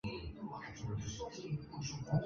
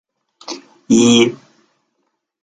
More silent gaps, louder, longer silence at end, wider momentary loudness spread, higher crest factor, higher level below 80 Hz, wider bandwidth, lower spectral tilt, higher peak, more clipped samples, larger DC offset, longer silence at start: neither; second, -44 LUFS vs -13 LUFS; second, 0 s vs 1.1 s; second, 5 LU vs 20 LU; about the same, 18 dB vs 16 dB; about the same, -56 dBFS vs -56 dBFS; second, 7.4 kHz vs 9.4 kHz; first, -6 dB/octave vs -4 dB/octave; second, -22 dBFS vs -2 dBFS; neither; neither; second, 0.05 s vs 0.5 s